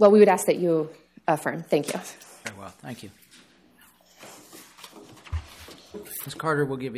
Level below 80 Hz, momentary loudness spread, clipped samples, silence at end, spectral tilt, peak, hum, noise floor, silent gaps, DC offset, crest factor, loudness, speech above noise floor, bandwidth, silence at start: -50 dBFS; 24 LU; under 0.1%; 0 s; -5.5 dB/octave; -4 dBFS; none; -57 dBFS; none; under 0.1%; 20 dB; -25 LUFS; 34 dB; 15.5 kHz; 0 s